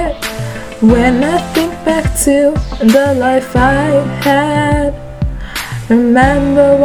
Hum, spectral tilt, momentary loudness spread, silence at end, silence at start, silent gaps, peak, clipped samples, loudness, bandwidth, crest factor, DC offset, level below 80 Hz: none; -5.5 dB/octave; 12 LU; 0 s; 0 s; none; 0 dBFS; 0.2%; -12 LUFS; 19 kHz; 12 dB; under 0.1%; -24 dBFS